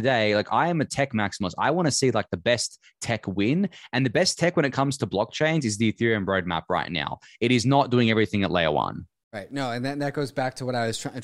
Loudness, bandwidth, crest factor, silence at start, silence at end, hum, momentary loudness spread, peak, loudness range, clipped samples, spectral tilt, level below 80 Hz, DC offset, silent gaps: -24 LUFS; 13.5 kHz; 18 dB; 0 s; 0 s; none; 8 LU; -6 dBFS; 2 LU; under 0.1%; -5 dB/octave; -56 dBFS; under 0.1%; 9.24-9.31 s